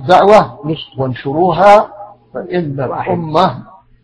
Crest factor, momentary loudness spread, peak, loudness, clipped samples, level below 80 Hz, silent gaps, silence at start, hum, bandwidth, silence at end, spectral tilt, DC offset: 12 dB; 16 LU; 0 dBFS; -12 LUFS; 2%; -46 dBFS; none; 0 s; none; 11 kHz; 0.4 s; -7 dB/octave; under 0.1%